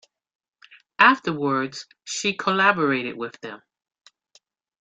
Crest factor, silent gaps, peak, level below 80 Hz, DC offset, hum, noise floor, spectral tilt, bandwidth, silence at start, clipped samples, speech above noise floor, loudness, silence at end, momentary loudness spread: 22 dB; none; -2 dBFS; -70 dBFS; under 0.1%; none; -61 dBFS; -3.5 dB/octave; 9.4 kHz; 1 s; under 0.1%; 39 dB; -21 LUFS; 1.25 s; 21 LU